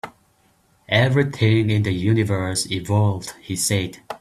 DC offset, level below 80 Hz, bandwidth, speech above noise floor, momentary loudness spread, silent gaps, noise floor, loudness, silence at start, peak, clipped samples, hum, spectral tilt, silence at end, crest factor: under 0.1%; -52 dBFS; 13.5 kHz; 40 dB; 10 LU; none; -60 dBFS; -20 LUFS; 0.05 s; -4 dBFS; under 0.1%; none; -5 dB/octave; 0.05 s; 18 dB